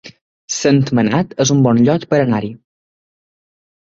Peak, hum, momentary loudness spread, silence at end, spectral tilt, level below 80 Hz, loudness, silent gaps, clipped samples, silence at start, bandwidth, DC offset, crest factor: -2 dBFS; none; 8 LU; 1.3 s; -5.5 dB/octave; -52 dBFS; -15 LUFS; 0.21-0.48 s; under 0.1%; 0.05 s; 7.8 kHz; under 0.1%; 16 dB